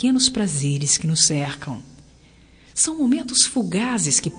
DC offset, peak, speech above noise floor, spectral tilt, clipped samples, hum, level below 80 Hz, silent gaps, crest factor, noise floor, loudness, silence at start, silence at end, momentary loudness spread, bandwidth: under 0.1%; 0 dBFS; 30 dB; -3 dB/octave; under 0.1%; none; -52 dBFS; none; 20 dB; -50 dBFS; -19 LUFS; 0 s; 0 s; 12 LU; 10 kHz